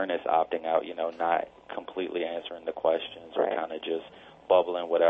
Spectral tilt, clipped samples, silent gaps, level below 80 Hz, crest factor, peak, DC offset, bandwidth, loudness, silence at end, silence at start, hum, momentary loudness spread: -6.5 dB/octave; under 0.1%; none; -70 dBFS; 20 dB; -8 dBFS; under 0.1%; 4.8 kHz; -29 LUFS; 0 s; 0 s; none; 12 LU